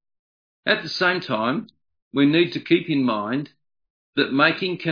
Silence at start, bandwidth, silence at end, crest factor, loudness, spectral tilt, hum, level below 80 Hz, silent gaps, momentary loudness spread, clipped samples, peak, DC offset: 0.65 s; 5.2 kHz; 0 s; 20 dB; -21 LUFS; -6.5 dB/octave; none; -70 dBFS; 2.02-2.11 s, 3.90-4.13 s; 11 LU; under 0.1%; -4 dBFS; under 0.1%